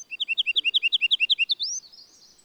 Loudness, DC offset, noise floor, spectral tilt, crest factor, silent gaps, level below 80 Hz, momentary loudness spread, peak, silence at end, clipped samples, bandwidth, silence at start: -21 LUFS; under 0.1%; -52 dBFS; 5 dB/octave; 14 dB; none; -80 dBFS; 7 LU; -12 dBFS; 0.55 s; under 0.1%; 15 kHz; 0 s